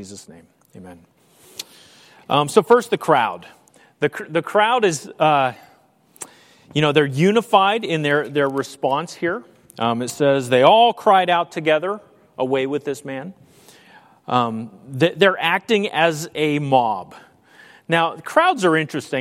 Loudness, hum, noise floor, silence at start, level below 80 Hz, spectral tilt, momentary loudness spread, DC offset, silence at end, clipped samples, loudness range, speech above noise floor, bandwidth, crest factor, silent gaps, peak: -18 LUFS; none; -54 dBFS; 0 s; -66 dBFS; -5 dB/octave; 18 LU; under 0.1%; 0 s; under 0.1%; 4 LU; 36 dB; 16.5 kHz; 20 dB; none; 0 dBFS